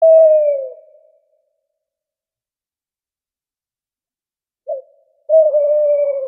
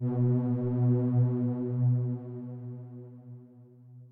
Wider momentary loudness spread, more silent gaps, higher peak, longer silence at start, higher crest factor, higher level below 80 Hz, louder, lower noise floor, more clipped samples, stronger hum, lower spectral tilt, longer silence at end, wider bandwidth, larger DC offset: about the same, 19 LU vs 21 LU; neither; first, -2 dBFS vs -16 dBFS; about the same, 0 s vs 0 s; about the same, 14 dB vs 12 dB; second, under -90 dBFS vs -70 dBFS; first, -13 LUFS vs -29 LUFS; first, under -90 dBFS vs -53 dBFS; neither; neither; second, -5.5 dB/octave vs -14 dB/octave; about the same, 0 s vs 0.05 s; first, 2.6 kHz vs 2.1 kHz; neither